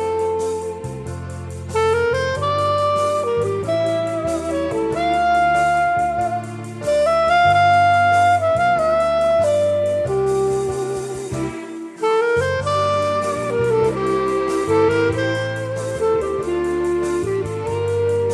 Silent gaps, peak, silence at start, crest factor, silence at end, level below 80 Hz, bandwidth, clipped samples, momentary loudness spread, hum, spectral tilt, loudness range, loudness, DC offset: none; -6 dBFS; 0 s; 12 dB; 0 s; -44 dBFS; 12.5 kHz; under 0.1%; 11 LU; none; -5.5 dB/octave; 5 LU; -19 LUFS; under 0.1%